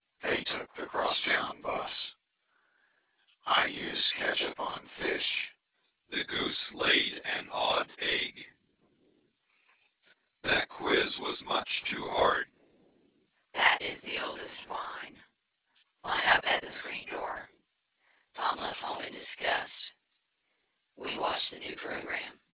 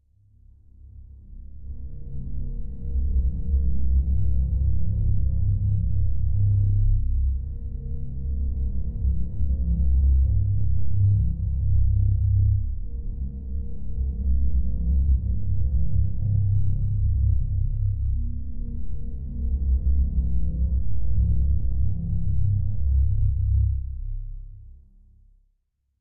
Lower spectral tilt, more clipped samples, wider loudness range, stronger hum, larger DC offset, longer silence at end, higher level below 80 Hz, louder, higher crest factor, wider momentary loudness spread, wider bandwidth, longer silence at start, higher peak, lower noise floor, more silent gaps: second, 0.5 dB/octave vs -16.5 dB/octave; neither; about the same, 6 LU vs 4 LU; neither; neither; first, 0.2 s vs 0 s; second, -64 dBFS vs -26 dBFS; second, -31 LUFS vs -26 LUFS; first, 26 dB vs 10 dB; first, 15 LU vs 12 LU; first, 4 kHz vs 0.8 kHz; first, 0.2 s vs 0 s; first, -8 dBFS vs -12 dBFS; first, -79 dBFS vs -72 dBFS; neither